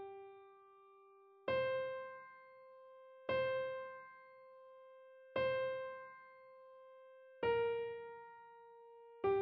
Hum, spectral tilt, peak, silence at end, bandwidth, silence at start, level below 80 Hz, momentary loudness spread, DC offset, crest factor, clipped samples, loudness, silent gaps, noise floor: none; -3 dB/octave; -26 dBFS; 0 s; 5.8 kHz; 0 s; -78 dBFS; 23 LU; under 0.1%; 18 dB; under 0.1%; -41 LUFS; none; -65 dBFS